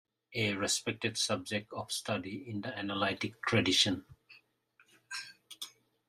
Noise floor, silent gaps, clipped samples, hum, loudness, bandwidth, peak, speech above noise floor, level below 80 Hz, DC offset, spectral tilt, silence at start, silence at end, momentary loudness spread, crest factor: -70 dBFS; none; under 0.1%; none; -33 LUFS; 15 kHz; -14 dBFS; 36 dB; -72 dBFS; under 0.1%; -3 dB/octave; 0.3 s; 0.4 s; 16 LU; 22 dB